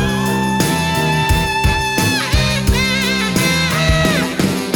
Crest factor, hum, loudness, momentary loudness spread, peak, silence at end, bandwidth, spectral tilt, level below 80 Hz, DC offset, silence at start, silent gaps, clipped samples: 12 dB; none; -15 LUFS; 2 LU; -2 dBFS; 0 s; 18 kHz; -4 dB/octave; -24 dBFS; under 0.1%; 0 s; none; under 0.1%